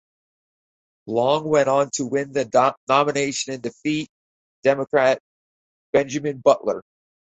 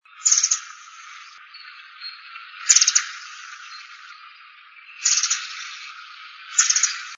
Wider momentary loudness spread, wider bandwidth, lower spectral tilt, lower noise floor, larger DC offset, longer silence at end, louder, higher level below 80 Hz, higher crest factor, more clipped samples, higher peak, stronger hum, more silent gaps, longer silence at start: second, 9 LU vs 24 LU; second, 8.4 kHz vs 10.5 kHz; first, -4.5 dB/octave vs 11.5 dB/octave; first, under -90 dBFS vs -47 dBFS; neither; first, 0.55 s vs 0 s; second, -21 LUFS vs -18 LUFS; first, -64 dBFS vs under -90 dBFS; second, 20 dB vs 26 dB; neither; second, -4 dBFS vs 0 dBFS; neither; first, 2.77-2.87 s, 4.09-4.63 s, 5.20-5.93 s vs none; first, 1.05 s vs 0.2 s